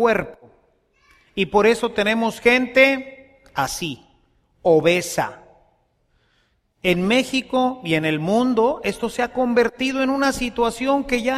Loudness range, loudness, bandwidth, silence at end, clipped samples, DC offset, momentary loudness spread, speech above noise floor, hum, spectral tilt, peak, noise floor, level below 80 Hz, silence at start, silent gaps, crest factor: 4 LU; -20 LUFS; 15 kHz; 0 s; under 0.1%; under 0.1%; 10 LU; 45 dB; none; -4.5 dB/octave; -2 dBFS; -65 dBFS; -48 dBFS; 0 s; none; 20 dB